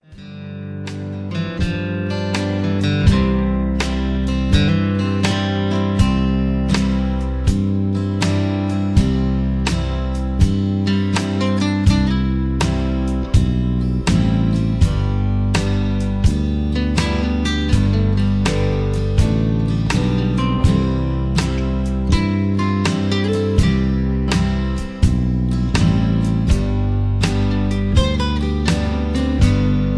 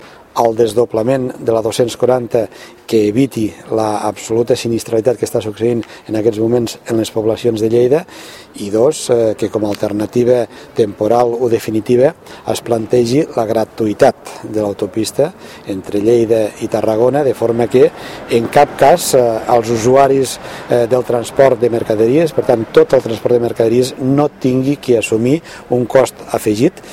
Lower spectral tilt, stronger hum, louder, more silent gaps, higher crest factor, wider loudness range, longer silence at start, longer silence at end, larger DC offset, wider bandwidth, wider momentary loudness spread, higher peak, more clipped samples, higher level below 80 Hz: about the same, -6.5 dB/octave vs -6 dB/octave; neither; second, -18 LUFS vs -14 LUFS; neither; about the same, 16 dB vs 14 dB; second, 1 LU vs 4 LU; about the same, 0.1 s vs 0 s; about the same, 0 s vs 0 s; neither; second, 11 kHz vs 16.5 kHz; second, 4 LU vs 8 LU; about the same, -2 dBFS vs 0 dBFS; second, under 0.1% vs 0.1%; first, -24 dBFS vs -48 dBFS